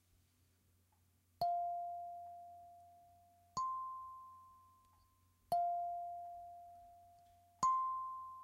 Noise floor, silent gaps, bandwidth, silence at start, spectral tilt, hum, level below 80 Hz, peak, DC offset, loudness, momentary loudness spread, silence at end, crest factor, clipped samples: -75 dBFS; none; 16 kHz; 1.4 s; -3.5 dB/octave; none; -78 dBFS; -24 dBFS; under 0.1%; -42 LUFS; 22 LU; 0 s; 20 dB; under 0.1%